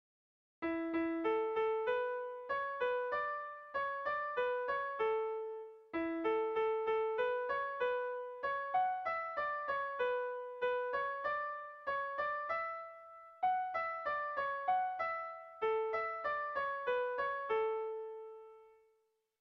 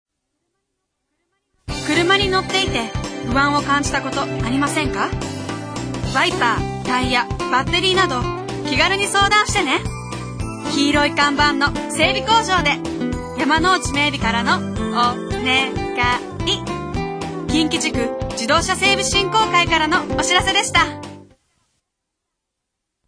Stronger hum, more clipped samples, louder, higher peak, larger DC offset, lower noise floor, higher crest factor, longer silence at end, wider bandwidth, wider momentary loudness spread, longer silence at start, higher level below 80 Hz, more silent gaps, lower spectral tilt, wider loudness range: neither; neither; second, -37 LUFS vs -18 LUFS; second, -24 dBFS vs -2 dBFS; neither; about the same, -78 dBFS vs -79 dBFS; about the same, 14 dB vs 18 dB; second, 0.7 s vs 1.85 s; second, 6 kHz vs 10.5 kHz; second, 8 LU vs 11 LU; second, 0.6 s vs 1.7 s; second, -74 dBFS vs -36 dBFS; neither; second, -1 dB/octave vs -3.5 dB/octave; about the same, 2 LU vs 4 LU